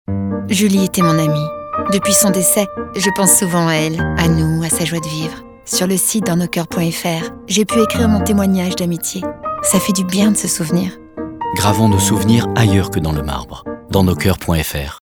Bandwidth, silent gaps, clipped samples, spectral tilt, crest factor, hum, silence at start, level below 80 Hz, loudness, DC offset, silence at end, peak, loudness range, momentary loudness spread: over 20 kHz; none; under 0.1%; -4.5 dB/octave; 16 dB; none; 0.1 s; -34 dBFS; -15 LUFS; under 0.1%; 0.1 s; 0 dBFS; 3 LU; 10 LU